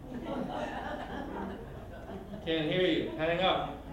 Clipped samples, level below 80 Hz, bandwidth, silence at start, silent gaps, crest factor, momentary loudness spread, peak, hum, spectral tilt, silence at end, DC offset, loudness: under 0.1%; -52 dBFS; 16 kHz; 0 s; none; 18 dB; 15 LU; -16 dBFS; none; -6.5 dB/octave; 0 s; under 0.1%; -33 LUFS